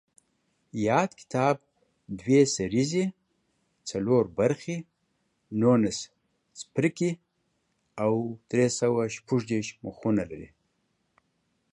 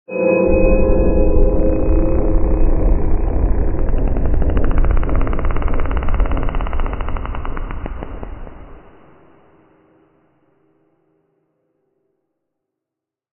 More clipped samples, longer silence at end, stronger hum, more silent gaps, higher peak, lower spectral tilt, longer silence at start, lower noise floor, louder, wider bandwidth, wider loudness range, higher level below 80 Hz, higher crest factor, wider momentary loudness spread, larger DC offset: neither; second, 1.25 s vs 4.55 s; neither; neither; second, -8 dBFS vs 0 dBFS; second, -5.5 dB/octave vs -8.5 dB/octave; first, 0.75 s vs 0.1 s; second, -75 dBFS vs -85 dBFS; second, -27 LUFS vs -19 LUFS; first, 11 kHz vs 3.1 kHz; second, 2 LU vs 17 LU; second, -62 dBFS vs -18 dBFS; about the same, 20 dB vs 16 dB; about the same, 15 LU vs 14 LU; neither